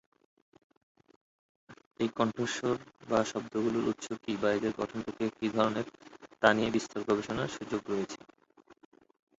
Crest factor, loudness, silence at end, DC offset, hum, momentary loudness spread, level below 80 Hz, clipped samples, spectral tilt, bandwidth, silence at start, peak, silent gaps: 26 dB; -32 LUFS; 0.65 s; under 0.1%; none; 9 LU; -64 dBFS; under 0.1%; -5 dB/octave; 8 kHz; 1.7 s; -6 dBFS; 1.86-1.91 s